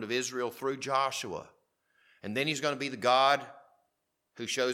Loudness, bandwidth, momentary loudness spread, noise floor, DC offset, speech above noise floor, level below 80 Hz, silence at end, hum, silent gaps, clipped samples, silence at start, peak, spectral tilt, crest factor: -30 LUFS; 17 kHz; 16 LU; -81 dBFS; under 0.1%; 50 dB; -78 dBFS; 0 s; none; none; under 0.1%; 0 s; -10 dBFS; -3 dB/octave; 22 dB